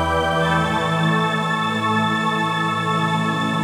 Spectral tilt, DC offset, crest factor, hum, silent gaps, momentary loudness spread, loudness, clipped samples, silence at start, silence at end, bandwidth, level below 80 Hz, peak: -5.5 dB/octave; under 0.1%; 12 dB; none; none; 2 LU; -19 LUFS; under 0.1%; 0 s; 0 s; 14 kHz; -42 dBFS; -6 dBFS